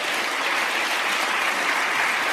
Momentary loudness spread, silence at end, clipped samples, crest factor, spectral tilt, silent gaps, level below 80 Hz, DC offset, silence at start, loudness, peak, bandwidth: 2 LU; 0 s; under 0.1%; 14 dB; 0 dB/octave; none; -74 dBFS; under 0.1%; 0 s; -21 LUFS; -10 dBFS; 15.5 kHz